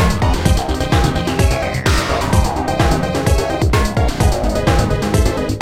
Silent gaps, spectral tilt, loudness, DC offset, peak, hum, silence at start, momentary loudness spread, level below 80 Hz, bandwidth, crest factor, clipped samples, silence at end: none; -5.5 dB/octave; -16 LUFS; 1%; 0 dBFS; none; 0 s; 1 LU; -20 dBFS; 16.5 kHz; 14 dB; under 0.1%; 0 s